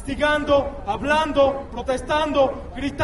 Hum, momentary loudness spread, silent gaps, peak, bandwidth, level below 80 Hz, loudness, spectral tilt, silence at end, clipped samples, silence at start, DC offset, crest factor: none; 9 LU; none; -6 dBFS; 11.5 kHz; -38 dBFS; -21 LUFS; -5 dB/octave; 0 s; under 0.1%; 0 s; under 0.1%; 16 dB